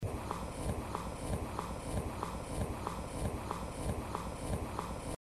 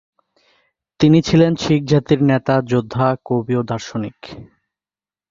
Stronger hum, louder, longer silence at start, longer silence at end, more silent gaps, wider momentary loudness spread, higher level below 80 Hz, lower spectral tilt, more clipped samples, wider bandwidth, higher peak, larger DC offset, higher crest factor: neither; second, -40 LUFS vs -17 LUFS; second, 0 s vs 1 s; second, 0.05 s vs 0.85 s; neither; second, 2 LU vs 13 LU; about the same, -46 dBFS vs -48 dBFS; second, -5.5 dB/octave vs -7 dB/octave; neither; first, 14 kHz vs 7.6 kHz; second, -20 dBFS vs 0 dBFS; neither; about the same, 18 dB vs 18 dB